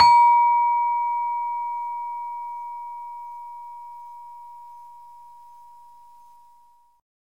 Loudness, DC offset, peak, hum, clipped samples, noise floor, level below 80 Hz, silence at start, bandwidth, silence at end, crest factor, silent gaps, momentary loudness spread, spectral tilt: -22 LUFS; 0.2%; -4 dBFS; none; under 0.1%; -57 dBFS; -66 dBFS; 0 s; 8.4 kHz; 2.2 s; 20 dB; none; 26 LU; -1 dB/octave